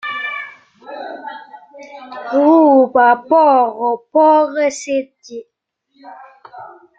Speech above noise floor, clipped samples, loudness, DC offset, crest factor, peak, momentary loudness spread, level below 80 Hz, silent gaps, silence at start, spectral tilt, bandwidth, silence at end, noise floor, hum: 44 dB; under 0.1%; -13 LUFS; under 0.1%; 14 dB; -2 dBFS; 23 LU; -68 dBFS; none; 0.05 s; -3.5 dB/octave; 9 kHz; 0.3 s; -58 dBFS; none